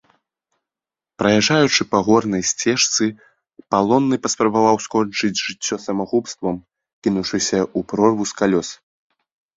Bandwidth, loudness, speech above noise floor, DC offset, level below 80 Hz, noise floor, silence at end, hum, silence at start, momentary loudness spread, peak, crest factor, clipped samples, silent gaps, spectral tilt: 7.8 kHz; -18 LUFS; 71 dB; under 0.1%; -56 dBFS; -89 dBFS; 0.8 s; none; 1.2 s; 8 LU; -2 dBFS; 18 dB; under 0.1%; 6.93-7.02 s; -3.5 dB/octave